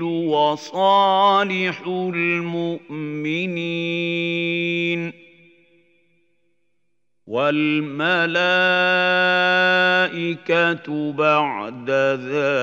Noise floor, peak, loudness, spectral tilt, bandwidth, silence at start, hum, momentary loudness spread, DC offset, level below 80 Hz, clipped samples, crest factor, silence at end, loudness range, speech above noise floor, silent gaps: -77 dBFS; -4 dBFS; -19 LUFS; -5.5 dB/octave; 7.8 kHz; 0 s; 60 Hz at -70 dBFS; 10 LU; under 0.1%; -78 dBFS; under 0.1%; 16 dB; 0 s; 9 LU; 57 dB; none